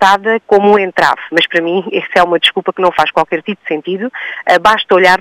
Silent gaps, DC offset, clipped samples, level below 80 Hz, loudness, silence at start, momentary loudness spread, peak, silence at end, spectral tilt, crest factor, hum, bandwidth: none; under 0.1%; 0.1%; -50 dBFS; -12 LUFS; 0 s; 10 LU; 0 dBFS; 0 s; -4 dB/octave; 12 dB; none; 16.5 kHz